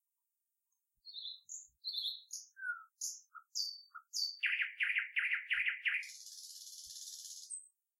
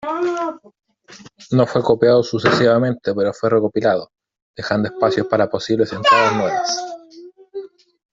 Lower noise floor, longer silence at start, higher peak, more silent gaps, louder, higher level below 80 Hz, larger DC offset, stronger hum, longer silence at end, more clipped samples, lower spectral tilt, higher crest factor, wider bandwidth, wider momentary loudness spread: first, -88 dBFS vs -44 dBFS; first, 1.05 s vs 0.05 s; second, -20 dBFS vs 0 dBFS; second, none vs 4.42-4.54 s; second, -39 LUFS vs -17 LUFS; second, -88 dBFS vs -56 dBFS; neither; neither; second, 0.3 s vs 0.45 s; neither; second, 7.5 dB/octave vs -5.5 dB/octave; about the same, 22 dB vs 18 dB; first, 16 kHz vs 7.8 kHz; about the same, 15 LU vs 15 LU